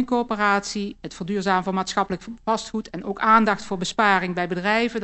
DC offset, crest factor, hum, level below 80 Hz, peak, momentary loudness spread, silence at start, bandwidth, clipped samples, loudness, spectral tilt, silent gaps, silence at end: under 0.1%; 20 dB; none; -52 dBFS; -2 dBFS; 12 LU; 0 s; 8.4 kHz; under 0.1%; -22 LUFS; -4.5 dB/octave; none; 0 s